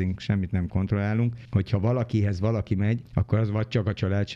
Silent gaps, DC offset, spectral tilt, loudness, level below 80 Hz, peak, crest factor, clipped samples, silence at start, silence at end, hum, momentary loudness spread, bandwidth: none; under 0.1%; -8.5 dB/octave; -26 LUFS; -46 dBFS; -10 dBFS; 16 dB; under 0.1%; 0 s; 0 s; none; 2 LU; 7 kHz